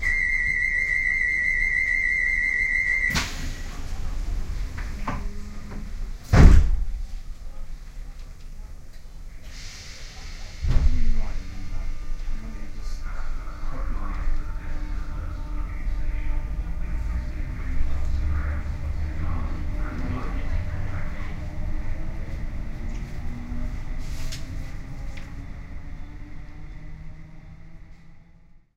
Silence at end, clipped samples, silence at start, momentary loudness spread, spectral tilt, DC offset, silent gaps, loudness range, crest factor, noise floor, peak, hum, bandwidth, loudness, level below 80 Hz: 0.2 s; under 0.1%; 0 s; 22 LU; -5.5 dB/octave; under 0.1%; none; 16 LU; 24 dB; -51 dBFS; 0 dBFS; none; 8.6 kHz; -27 LUFS; -26 dBFS